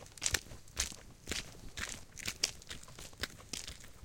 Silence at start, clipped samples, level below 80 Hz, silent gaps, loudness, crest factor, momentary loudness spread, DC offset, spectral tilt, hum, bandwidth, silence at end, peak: 0 s; under 0.1%; -54 dBFS; none; -40 LUFS; 34 dB; 13 LU; under 0.1%; -1 dB/octave; none; 17 kHz; 0 s; -8 dBFS